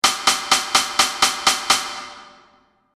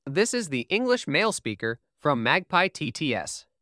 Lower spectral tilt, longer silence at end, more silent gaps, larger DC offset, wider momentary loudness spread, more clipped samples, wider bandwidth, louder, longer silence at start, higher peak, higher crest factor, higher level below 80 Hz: second, 1 dB/octave vs -4 dB/octave; first, 0.65 s vs 0.2 s; neither; neither; first, 13 LU vs 8 LU; neither; first, 16 kHz vs 11 kHz; first, -17 LUFS vs -25 LUFS; about the same, 0.05 s vs 0.05 s; first, 0 dBFS vs -6 dBFS; about the same, 20 dB vs 20 dB; first, -54 dBFS vs -66 dBFS